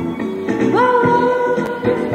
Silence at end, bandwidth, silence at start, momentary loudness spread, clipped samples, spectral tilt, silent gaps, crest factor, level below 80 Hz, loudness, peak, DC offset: 0 s; 10.5 kHz; 0 s; 8 LU; under 0.1%; -7 dB/octave; none; 14 dB; -50 dBFS; -16 LUFS; -2 dBFS; under 0.1%